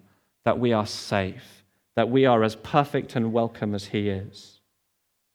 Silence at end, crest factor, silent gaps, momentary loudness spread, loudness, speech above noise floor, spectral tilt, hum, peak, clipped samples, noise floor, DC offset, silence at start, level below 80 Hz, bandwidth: 0.9 s; 22 dB; none; 11 LU; -25 LUFS; 50 dB; -6.5 dB/octave; none; -4 dBFS; under 0.1%; -74 dBFS; under 0.1%; 0.45 s; -64 dBFS; 15.5 kHz